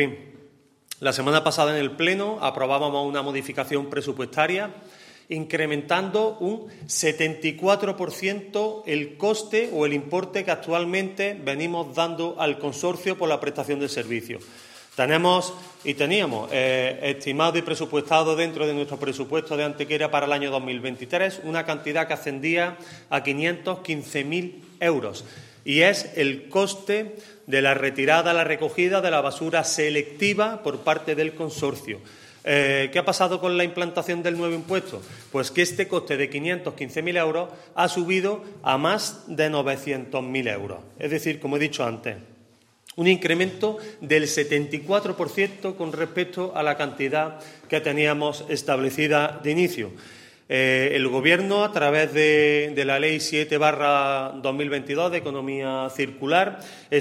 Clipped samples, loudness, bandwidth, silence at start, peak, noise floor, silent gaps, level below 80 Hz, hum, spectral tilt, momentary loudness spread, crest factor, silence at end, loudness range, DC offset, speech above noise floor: under 0.1%; -24 LUFS; 16 kHz; 0 s; -2 dBFS; -57 dBFS; none; -70 dBFS; none; -4 dB/octave; 9 LU; 22 dB; 0 s; 5 LU; under 0.1%; 33 dB